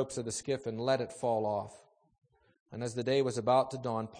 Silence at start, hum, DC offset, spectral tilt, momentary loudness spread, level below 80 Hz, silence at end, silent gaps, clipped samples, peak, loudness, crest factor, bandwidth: 0 s; none; under 0.1%; -5 dB/octave; 10 LU; -70 dBFS; 0 s; 2.60-2.66 s; under 0.1%; -14 dBFS; -33 LUFS; 18 dB; 9.8 kHz